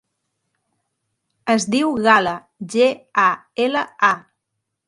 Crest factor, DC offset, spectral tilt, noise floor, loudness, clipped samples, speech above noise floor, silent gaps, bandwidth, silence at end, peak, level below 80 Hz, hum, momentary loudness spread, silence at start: 20 dB; under 0.1%; -3.5 dB/octave; -78 dBFS; -18 LUFS; under 0.1%; 60 dB; none; 11.5 kHz; 0.7 s; 0 dBFS; -64 dBFS; none; 10 LU; 1.45 s